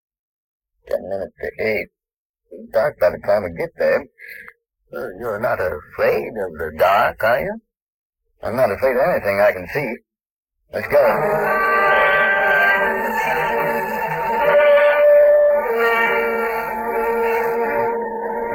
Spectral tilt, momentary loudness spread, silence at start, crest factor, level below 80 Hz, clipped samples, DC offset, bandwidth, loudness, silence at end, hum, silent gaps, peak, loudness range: -5.5 dB/octave; 15 LU; 0.85 s; 14 dB; -50 dBFS; under 0.1%; under 0.1%; 17 kHz; -18 LUFS; 0 s; none; 2.17-2.34 s, 7.82-8.10 s, 10.31-10.43 s; -4 dBFS; 7 LU